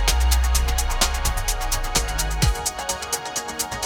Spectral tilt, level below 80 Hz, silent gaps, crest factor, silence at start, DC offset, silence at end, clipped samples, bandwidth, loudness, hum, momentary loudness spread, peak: -2.5 dB/octave; -24 dBFS; none; 18 dB; 0 s; under 0.1%; 0 s; under 0.1%; 19.5 kHz; -23 LUFS; none; 5 LU; -4 dBFS